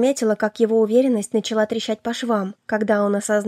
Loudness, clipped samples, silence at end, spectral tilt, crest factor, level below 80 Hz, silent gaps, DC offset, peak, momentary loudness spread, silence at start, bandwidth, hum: -20 LUFS; under 0.1%; 0 s; -4.5 dB/octave; 14 dB; -68 dBFS; none; under 0.1%; -6 dBFS; 7 LU; 0 s; 14 kHz; none